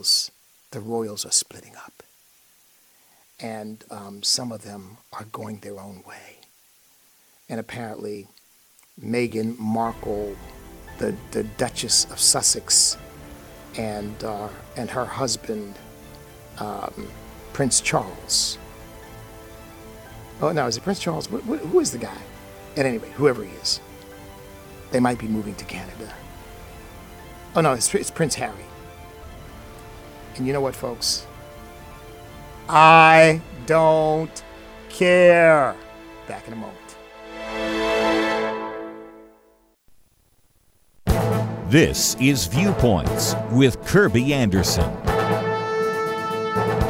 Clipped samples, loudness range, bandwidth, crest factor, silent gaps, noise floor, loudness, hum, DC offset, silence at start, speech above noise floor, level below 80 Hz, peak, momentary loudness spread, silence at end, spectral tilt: under 0.1%; 13 LU; 19 kHz; 22 dB; none; -61 dBFS; -20 LUFS; none; under 0.1%; 0.05 s; 40 dB; -42 dBFS; -2 dBFS; 25 LU; 0 s; -3.5 dB/octave